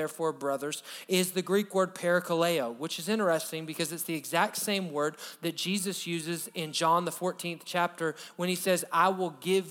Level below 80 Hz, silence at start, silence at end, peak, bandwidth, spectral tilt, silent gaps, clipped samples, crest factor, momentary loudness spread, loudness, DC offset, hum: -88 dBFS; 0 s; 0 s; -12 dBFS; over 20 kHz; -3.5 dB/octave; none; under 0.1%; 18 dB; 8 LU; -30 LUFS; under 0.1%; none